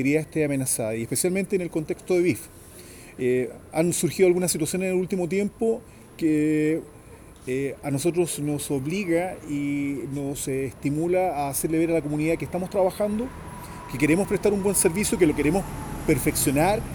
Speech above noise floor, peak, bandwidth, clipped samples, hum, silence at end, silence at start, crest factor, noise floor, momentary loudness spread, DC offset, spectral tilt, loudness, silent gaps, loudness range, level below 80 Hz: 22 dB; -8 dBFS; over 20 kHz; under 0.1%; none; 0 s; 0 s; 18 dB; -46 dBFS; 9 LU; under 0.1%; -5 dB/octave; -24 LUFS; none; 3 LU; -46 dBFS